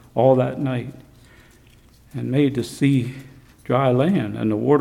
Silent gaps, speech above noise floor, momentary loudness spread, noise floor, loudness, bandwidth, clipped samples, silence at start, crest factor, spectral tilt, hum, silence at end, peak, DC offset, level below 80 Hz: none; 32 dB; 17 LU; -51 dBFS; -21 LUFS; 14 kHz; under 0.1%; 0.15 s; 18 dB; -8 dB/octave; none; 0 s; -4 dBFS; under 0.1%; -54 dBFS